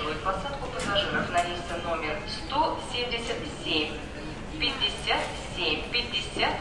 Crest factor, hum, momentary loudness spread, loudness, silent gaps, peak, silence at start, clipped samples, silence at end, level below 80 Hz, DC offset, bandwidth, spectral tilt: 18 dB; none; 7 LU; -29 LUFS; none; -12 dBFS; 0 s; under 0.1%; 0 s; -44 dBFS; 0.3%; 11.5 kHz; -3.5 dB/octave